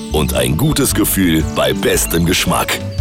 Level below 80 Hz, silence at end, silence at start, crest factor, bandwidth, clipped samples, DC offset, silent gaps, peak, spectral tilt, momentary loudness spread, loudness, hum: -28 dBFS; 0 s; 0 s; 8 dB; 17.5 kHz; under 0.1%; under 0.1%; none; -6 dBFS; -4 dB/octave; 3 LU; -14 LUFS; none